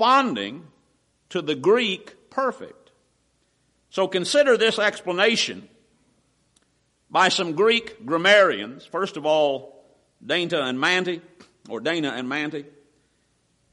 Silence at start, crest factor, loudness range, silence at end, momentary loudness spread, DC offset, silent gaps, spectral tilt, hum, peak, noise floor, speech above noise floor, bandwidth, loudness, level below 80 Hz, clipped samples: 0 s; 18 dB; 6 LU; 1.1 s; 15 LU; under 0.1%; none; -3.5 dB/octave; none; -6 dBFS; -67 dBFS; 45 dB; 11.5 kHz; -22 LUFS; -70 dBFS; under 0.1%